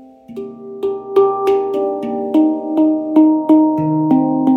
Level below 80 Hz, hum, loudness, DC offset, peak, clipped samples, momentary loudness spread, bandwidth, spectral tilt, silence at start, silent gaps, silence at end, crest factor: -58 dBFS; none; -15 LUFS; under 0.1%; -2 dBFS; under 0.1%; 17 LU; 4 kHz; -9.5 dB/octave; 0 s; none; 0 s; 14 dB